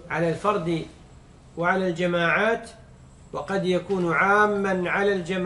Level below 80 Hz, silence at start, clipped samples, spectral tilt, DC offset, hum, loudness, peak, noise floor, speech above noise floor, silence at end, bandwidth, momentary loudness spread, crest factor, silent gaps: -52 dBFS; 0 s; under 0.1%; -6 dB/octave; under 0.1%; none; -23 LUFS; -6 dBFS; -49 dBFS; 25 dB; 0 s; 11.5 kHz; 14 LU; 18 dB; none